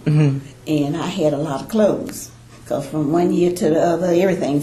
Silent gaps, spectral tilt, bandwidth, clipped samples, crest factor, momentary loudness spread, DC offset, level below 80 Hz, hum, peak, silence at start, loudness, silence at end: none; -7 dB/octave; 14 kHz; under 0.1%; 16 dB; 10 LU; under 0.1%; -50 dBFS; none; -4 dBFS; 0 s; -19 LUFS; 0 s